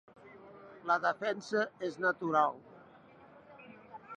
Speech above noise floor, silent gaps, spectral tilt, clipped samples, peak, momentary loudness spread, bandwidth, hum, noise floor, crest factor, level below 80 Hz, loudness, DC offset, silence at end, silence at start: 25 dB; none; -5 dB/octave; under 0.1%; -16 dBFS; 24 LU; 10 kHz; none; -58 dBFS; 20 dB; -82 dBFS; -33 LUFS; under 0.1%; 0 s; 0.25 s